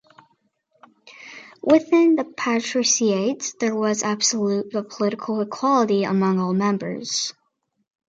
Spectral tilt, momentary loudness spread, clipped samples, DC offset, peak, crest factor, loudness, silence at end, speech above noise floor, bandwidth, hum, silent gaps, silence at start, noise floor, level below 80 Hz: -4 dB/octave; 9 LU; under 0.1%; under 0.1%; -4 dBFS; 18 dB; -21 LUFS; 0.8 s; 46 dB; 9.4 kHz; none; none; 1.05 s; -67 dBFS; -70 dBFS